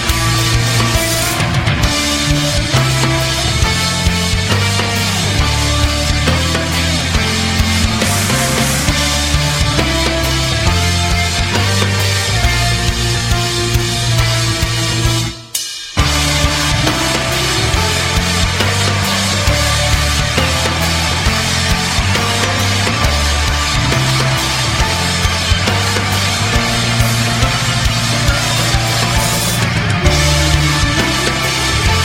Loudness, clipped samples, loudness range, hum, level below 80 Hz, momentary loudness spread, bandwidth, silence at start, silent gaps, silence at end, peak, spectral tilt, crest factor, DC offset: -13 LUFS; under 0.1%; 1 LU; none; -22 dBFS; 2 LU; 16.5 kHz; 0 s; none; 0 s; 0 dBFS; -3.5 dB/octave; 14 dB; under 0.1%